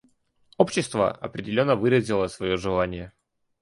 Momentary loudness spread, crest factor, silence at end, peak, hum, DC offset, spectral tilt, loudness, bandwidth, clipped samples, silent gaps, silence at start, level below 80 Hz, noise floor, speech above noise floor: 10 LU; 22 dB; 0.55 s; -2 dBFS; none; under 0.1%; -5.5 dB/octave; -24 LUFS; 11.5 kHz; under 0.1%; none; 0.6 s; -50 dBFS; -64 dBFS; 40 dB